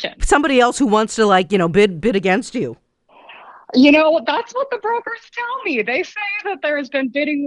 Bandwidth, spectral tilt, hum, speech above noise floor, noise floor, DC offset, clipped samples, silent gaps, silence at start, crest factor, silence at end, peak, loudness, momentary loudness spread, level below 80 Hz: 11 kHz; -4.5 dB/octave; none; 29 dB; -46 dBFS; under 0.1%; under 0.1%; none; 0 s; 14 dB; 0 s; -2 dBFS; -17 LUFS; 10 LU; -36 dBFS